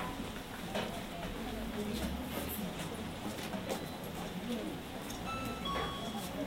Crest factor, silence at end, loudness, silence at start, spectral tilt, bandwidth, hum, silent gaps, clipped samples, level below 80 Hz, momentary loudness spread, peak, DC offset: 16 dB; 0 s; -40 LUFS; 0 s; -4.5 dB/octave; 16 kHz; none; none; under 0.1%; -52 dBFS; 5 LU; -24 dBFS; under 0.1%